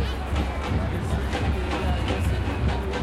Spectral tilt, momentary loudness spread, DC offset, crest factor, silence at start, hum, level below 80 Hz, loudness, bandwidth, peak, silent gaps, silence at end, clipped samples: -6.5 dB/octave; 2 LU; under 0.1%; 12 dB; 0 s; none; -28 dBFS; -26 LUFS; 13 kHz; -12 dBFS; none; 0 s; under 0.1%